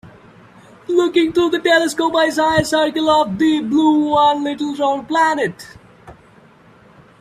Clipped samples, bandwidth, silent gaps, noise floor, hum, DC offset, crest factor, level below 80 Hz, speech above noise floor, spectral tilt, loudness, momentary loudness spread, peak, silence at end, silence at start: under 0.1%; 14 kHz; none; -47 dBFS; none; under 0.1%; 16 dB; -50 dBFS; 32 dB; -4.5 dB/octave; -16 LUFS; 6 LU; 0 dBFS; 1.1 s; 0.05 s